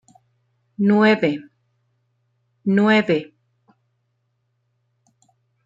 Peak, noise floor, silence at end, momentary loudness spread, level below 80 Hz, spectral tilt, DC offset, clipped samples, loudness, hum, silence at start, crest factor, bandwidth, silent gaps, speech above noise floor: -4 dBFS; -71 dBFS; 2.4 s; 14 LU; -70 dBFS; -7.5 dB/octave; under 0.1%; under 0.1%; -18 LUFS; none; 0.8 s; 18 dB; 7.6 kHz; none; 54 dB